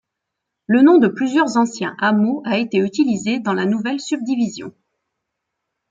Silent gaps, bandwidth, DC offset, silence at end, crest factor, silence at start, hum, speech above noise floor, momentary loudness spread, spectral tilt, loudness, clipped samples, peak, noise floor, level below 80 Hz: none; 8.8 kHz; under 0.1%; 1.2 s; 16 dB; 0.7 s; none; 63 dB; 10 LU; -5.5 dB/octave; -17 LUFS; under 0.1%; -2 dBFS; -80 dBFS; -66 dBFS